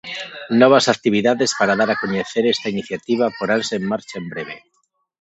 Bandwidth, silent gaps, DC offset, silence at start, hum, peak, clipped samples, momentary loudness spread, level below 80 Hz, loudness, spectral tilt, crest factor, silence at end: 8.4 kHz; none; under 0.1%; 0.05 s; none; 0 dBFS; under 0.1%; 16 LU; -62 dBFS; -18 LUFS; -4 dB/octave; 18 dB; 0.6 s